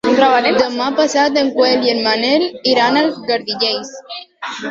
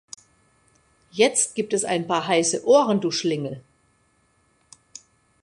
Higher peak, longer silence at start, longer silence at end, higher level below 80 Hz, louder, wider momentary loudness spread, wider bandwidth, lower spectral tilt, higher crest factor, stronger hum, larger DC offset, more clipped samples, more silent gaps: first, 0 dBFS vs -4 dBFS; second, 0.05 s vs 1.15 s; second, 0 s vs 1.8 s; first, -58 dBFS vs -68 dBFS; first, -14 LUFS vs -21 LUFS; second, 15 LU vs 25 LU; second, 7.8 kHz vs 11.5 kHz; about the same, -3 dB/octave vs -3.5 dB/octave; second, 14 dB vs 20 dB; neither; neither; neither; neither